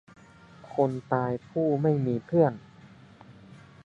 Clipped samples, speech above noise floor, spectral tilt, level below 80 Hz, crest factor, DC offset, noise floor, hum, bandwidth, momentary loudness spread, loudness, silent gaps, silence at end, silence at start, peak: under 0.1%; 26 dB; -10 dB/octave; -66 dBFS; 20 dB; under 0.1%; -52 dBFS; none; 7.6 kHz; 6 LU; -27 LUFS; none; 0.25 s; 0.65 s; -10 dBFS